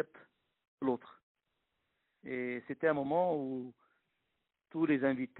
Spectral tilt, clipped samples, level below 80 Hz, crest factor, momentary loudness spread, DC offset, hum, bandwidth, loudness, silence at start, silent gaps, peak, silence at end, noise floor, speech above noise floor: -6 dB/octave; under 0.1%; -80 dBFS; 20 dB; 13 LU; under 0.1%; none; 4 kHz; -35 LUFS; 0 s; 0.68-0.78 s, 1.23-1.35 s; -18 dBFS; 0 s; -85 dBFS; 50 dB